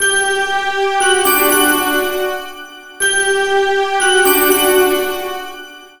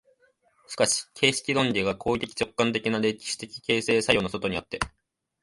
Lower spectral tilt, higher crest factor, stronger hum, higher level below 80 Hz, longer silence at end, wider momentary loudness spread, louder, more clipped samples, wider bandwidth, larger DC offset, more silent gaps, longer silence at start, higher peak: second, -0.5 dB/octave vs -3.5 dB/octave; second, 14 dB vs 24 dB; neither; about the same, -48 dBFS vs -52 dBFS; second, 0.15 s vs 0.55 s; first, 15 LU vs 10 LU; first, -13 LUFS vs -26 LUFS; neither; first, 18 kHz vs 11.5 kHz; neither; neither; second, 0 s vs 0.7 s; first, 0 dBFS vs -4 dBFS